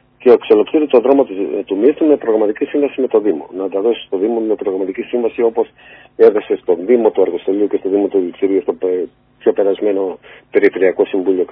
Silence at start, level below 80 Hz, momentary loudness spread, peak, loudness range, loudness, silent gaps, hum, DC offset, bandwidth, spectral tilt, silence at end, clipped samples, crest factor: 0.2 s; -60 dBFS; 8 LU; 0 dBFS; 3 LU; -15 LUFS; none; none; under 0.1%; 4.5 kHz; -9 dB/octave; 0.05 s; 0.2%; 14 dB